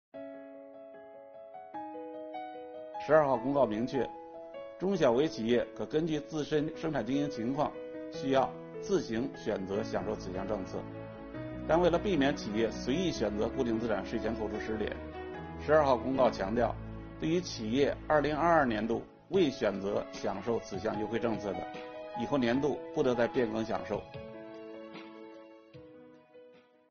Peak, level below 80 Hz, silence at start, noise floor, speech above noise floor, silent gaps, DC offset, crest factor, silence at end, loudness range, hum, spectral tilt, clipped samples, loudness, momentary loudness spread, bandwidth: -10 dBFS; -54 dBFS; 0.15 s; -59 dBFS; 28 dB; none; under 0.1%; 22 dB; 0.4 s; 4 LU; none; -5 dB/octave; under 0.1%; -32 LUFS; 18 LU; 7 kHz